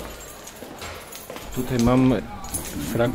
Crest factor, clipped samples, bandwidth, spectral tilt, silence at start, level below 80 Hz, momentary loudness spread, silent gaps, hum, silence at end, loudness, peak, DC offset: 18 dB; under 0.1%; 16.5 kHz; -5.5 dB/octave; 0 s; -40 dBFS; 19 LU; none; none; 0 s; -24 LUFS; -6 dBFS; under 0.1%